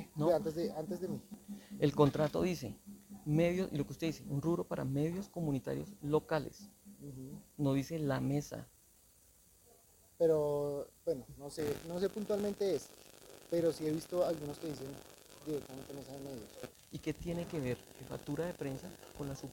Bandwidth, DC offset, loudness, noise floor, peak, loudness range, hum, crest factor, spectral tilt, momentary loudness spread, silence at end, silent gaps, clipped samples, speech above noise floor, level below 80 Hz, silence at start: 17 kHz; under 0.1%; -37 LUFS; -66 dBFS; -14 dBFS; 7 LU; none; 24 dB; -7 dB/octave; 17 LU; 0 s; none; under 0.1%; 29 dB; -62 dBFS; 0 s